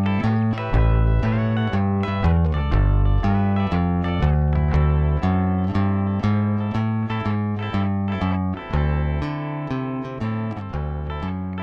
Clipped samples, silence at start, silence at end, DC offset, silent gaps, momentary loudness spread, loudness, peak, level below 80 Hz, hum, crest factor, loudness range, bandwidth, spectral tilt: under 0.1%; 0 s; 0 s; under 0.1%; none; 8 LU; -22 LUFS; -10 dBFS; -26 dBFS; none; 12 dB; 4 LU; 6.2 kHz; -9.5 dB/octave